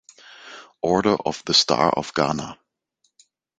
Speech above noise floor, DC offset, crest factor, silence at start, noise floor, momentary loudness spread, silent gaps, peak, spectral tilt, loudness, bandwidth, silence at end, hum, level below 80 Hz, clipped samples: 50 dB; under 0.1%; 22 dB; 0.3 s; -71 dBFS; 23 LU; none; -2 dBFS; -3.5 dB/octave; -21 LUFS; 9.4 kHz; 1.05 s; none; -56 dBFS; under 0.1%